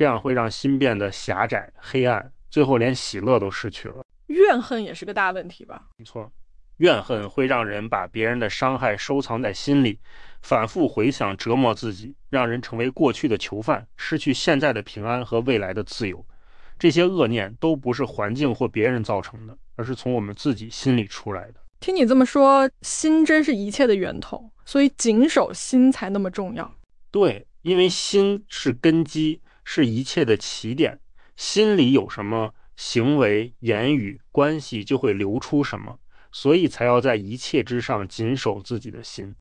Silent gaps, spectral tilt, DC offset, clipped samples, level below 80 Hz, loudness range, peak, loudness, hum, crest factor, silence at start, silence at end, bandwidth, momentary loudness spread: 4.05-4.09 s; -5.5 dB/octave; under 0.1%; under 0.1%; -52 dBFS; 5 LU; -6 dBFS; -22 LUFS; none; 16 dB; 0 s; 0.05 s; 10.5 kHz; 13 LU